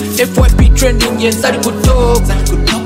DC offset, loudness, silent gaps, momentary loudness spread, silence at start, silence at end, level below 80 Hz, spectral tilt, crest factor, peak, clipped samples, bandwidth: under 0.1%; -11 LUFS; none; 4 LU; 0 s; 0 s; -12 dBFS; -5 dB/octave; 10 dB; 0 dBFS; under 0.1%; 16.5 kHz